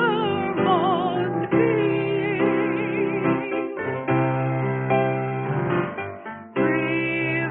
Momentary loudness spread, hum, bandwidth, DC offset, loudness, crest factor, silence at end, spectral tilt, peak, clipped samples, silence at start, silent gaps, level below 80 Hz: 7 LU; none; 4 kHz; under 0.1%; -23 LUFS; 14 dB; 0 s; -11.5 dB/octave; -8 dBFS; under 0.1%; 0 s; none; -58 dBFS